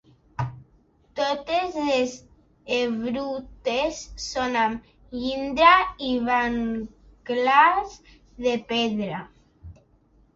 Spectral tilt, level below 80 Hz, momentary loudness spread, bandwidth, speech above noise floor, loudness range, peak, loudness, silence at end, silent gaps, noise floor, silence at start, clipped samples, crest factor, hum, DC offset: -4.5 dB/octave; -52 dBFS; 18 LU; 8 kHz; 36 dB; 6 LU; -4 dBFS; -24 LUFS; 0.65 s; none; -60 dBFS; 0.4 s; under 0.1%; 22 dB; none; under 0.1%